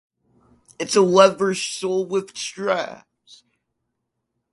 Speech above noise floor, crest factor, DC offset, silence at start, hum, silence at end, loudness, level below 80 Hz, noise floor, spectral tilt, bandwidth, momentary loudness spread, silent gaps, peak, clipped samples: 58 dB; 22 dB; under 0.1%; 0.8 s; none; 1.6 s; -20 LUFS; -68 dBFS; -77 dBFS; -4 dB/octave; 11.5 kHz; 15 LU; none; 0 dBFS; under 0.1%